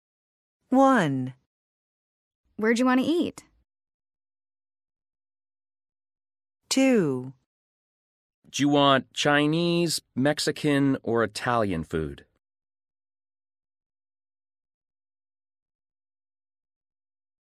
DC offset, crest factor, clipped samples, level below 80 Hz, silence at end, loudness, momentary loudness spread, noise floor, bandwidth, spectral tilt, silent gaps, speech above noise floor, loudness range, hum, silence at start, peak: under 0.1%; 22 dB; under 0.1%; -58 dBFS; 5.35 s; -24 LUFS; 12 LU; under -90 dBFS; 14.5 kHz; -5 dB/octave; 1.46-2.44 s, 3.94-4.00 s, 7.46-8.42 s; over 67 dB; 9 LU; none; 0.7 s; -6 dBFS